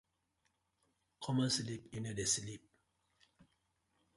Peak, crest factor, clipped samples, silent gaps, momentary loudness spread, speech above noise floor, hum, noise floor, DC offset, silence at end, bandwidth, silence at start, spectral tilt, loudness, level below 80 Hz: -22 dBFS; 22 dB; under 0.1%; none; 15 LU; 44 dB; none; -82 dBFS; under 0.1%; 0.75 s; 11.5 kHz; 1.2 s; -3.5 dB/octave; -38 LUFS; -70 dBFS